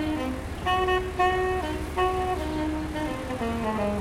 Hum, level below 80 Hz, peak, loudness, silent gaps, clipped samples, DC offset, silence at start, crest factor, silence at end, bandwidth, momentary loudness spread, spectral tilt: none; -38 dBFS; -12 dBFS; -27 LUFS; none; under 0.1%; under 0.1%; 0 s; 16 dB; 0 s; 16 kHz; 7 LU; -5.5 dB/octave